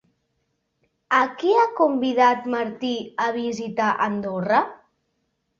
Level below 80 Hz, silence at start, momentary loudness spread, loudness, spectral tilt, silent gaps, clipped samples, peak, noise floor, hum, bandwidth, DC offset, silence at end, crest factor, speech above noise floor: -68 dBFS; 1.1 s; 9 LU; -22 LUFS; -5.5 dB/octave; none; under 0.1%; -6 dBFS; -73 dBFS; none; 7.4 kHz; under 0.1%; 0.85 s; 18 dB; 52 dB